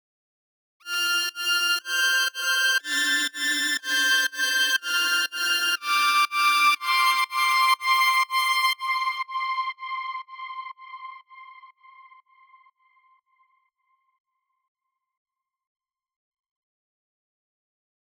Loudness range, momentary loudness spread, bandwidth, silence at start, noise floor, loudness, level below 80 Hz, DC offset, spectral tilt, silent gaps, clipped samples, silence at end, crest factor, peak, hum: 14 LU; 14 LU; over 20 kHz; 0.85 s; -72 dBFS; -22 LUFS; under -90 dBFS; under 0.1%; 4.5 dB/octave; none; under 0.1%; 6.15 s; 16 dB; -10 dBFS; none